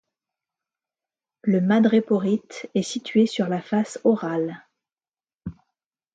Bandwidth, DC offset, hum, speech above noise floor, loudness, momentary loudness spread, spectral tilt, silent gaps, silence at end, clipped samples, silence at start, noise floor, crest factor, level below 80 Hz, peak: 9.2 kHz; under 0.1%; none; over 69 dB; -23 LUFS; 21 LU; -6.5 dB/octave; 5.34-5.38 s; 0.6 s; under 0.1%; 1.45 s; under -90 dBFS; 16 dB; -62 dBFS; -8 dBFS